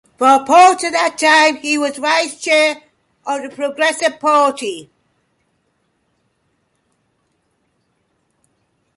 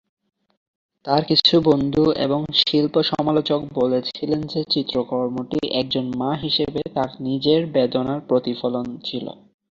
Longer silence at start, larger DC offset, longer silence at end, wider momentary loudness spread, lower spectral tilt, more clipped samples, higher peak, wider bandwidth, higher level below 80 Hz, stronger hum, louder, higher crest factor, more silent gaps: second, 0.2 s vs 1.05 s; neither; first, 4.15 s vs 0.4 s; first, 15 LU vs 8 LU; second, -1 dB/octave vs -7 dB/octave; neither; about the same, 0 dBFS vs -2 dBFS; first, 11.5 kHz vs 7.4 kHz; second, -68 dBFS vs -54 dBFS; neither; first, -14 LUFS vs -20 LUFS; about the same, 16 dB vs 20 dB; neither